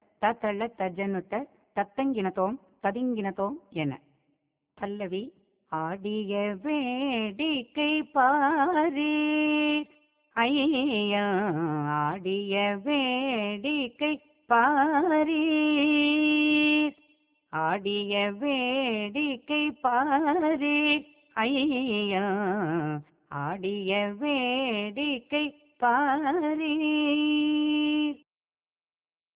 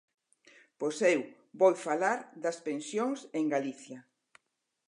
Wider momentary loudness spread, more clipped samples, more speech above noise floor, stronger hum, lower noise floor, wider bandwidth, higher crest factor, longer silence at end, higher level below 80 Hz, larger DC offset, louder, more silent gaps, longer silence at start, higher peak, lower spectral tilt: second, 10 LU vs 17 LU; neither; first, over 63 dB vs 52 dB; neither; first, under -90 dBFS vs -83 dBFS; second, 4 kHz vs 11 kHz; about the same, 18 dB vs 20 dB; first, 1.2 s vs 0.85 s; first, -68 dBFS vs -90 dBFS; neither; first, -27 LUFS vs -31 LUFS; neither; second, 0.2 s vs 0.8 s; about the same, -10 dBFS vs -12 dBFS; second, -2.5 dB/octave vs -4.5 dB/octave